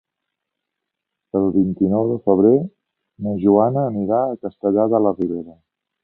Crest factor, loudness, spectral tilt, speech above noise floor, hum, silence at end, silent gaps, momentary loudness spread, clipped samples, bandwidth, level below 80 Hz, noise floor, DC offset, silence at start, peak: 18 dB; -18 LUFS; -14 dB/octave; 64 dB; none; 0.5 s; none; 11 LU; under 0.1%; 2.9 kHz; -54 dBFS; -81 dBFS; under 0.1%; 1.35 s; -2 dBFS